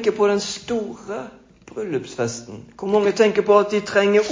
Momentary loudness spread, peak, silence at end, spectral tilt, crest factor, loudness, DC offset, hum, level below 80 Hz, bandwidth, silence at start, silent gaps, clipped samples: 16 LU; -2 dBFS; 0 s; -4.5 dB/octave; 18 dB; -20 LUFS; under 0.1%; none; -58 dBFS; 7.6 kHz; 0 s; none; under 0.1%